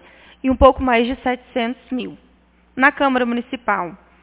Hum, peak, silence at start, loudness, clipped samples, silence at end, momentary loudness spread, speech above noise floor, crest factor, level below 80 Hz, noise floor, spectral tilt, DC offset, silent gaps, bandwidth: none; 0 dBFS; 0.45 s; -18 LUFS; under 0.1%; 0.25 s; 14 LU; 36 dB; 18 dB; -36 dBFS; -54 dBFS; -9 dB/octave; under 0.1%; none; 4 kHz